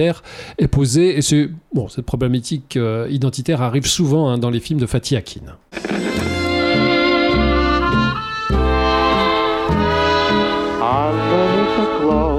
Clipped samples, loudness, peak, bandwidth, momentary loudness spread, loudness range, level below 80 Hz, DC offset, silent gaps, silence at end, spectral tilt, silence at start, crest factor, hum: under 0.1%; -17 LUFS; -4 dBFS; 15 kHz; 8 LU; 3 LU; -30 dBFS; under 0.1%; none; 0 s; -5.5 dB/octave; 0 s; 12 dB; none